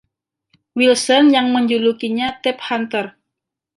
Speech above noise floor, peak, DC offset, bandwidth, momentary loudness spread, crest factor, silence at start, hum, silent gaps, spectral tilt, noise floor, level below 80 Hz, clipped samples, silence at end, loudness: 65 dB; -2 dBFS; under 0.1%; 11.5 kHz; 11 LU; 16 dB; 0.75 s; none; none; -3 dB/octave; -81 dBFS; -64 dBFS; under 0.1%; 0.7 s; -16 LUFS